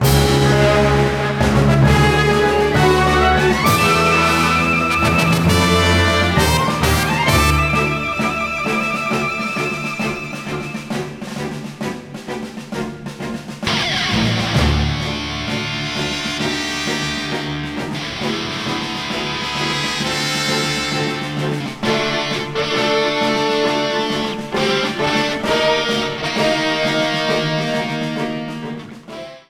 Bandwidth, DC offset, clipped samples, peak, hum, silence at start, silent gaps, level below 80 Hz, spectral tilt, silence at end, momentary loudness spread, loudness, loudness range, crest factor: 16 kHz; under 0.1%; under 0.1%; -2 dBFS; none; 0 s; none; -30 dBFS; -4.5 dB/octave; 0.1 s; 13 LU; -17 LUFS; 8 LU; 16 dB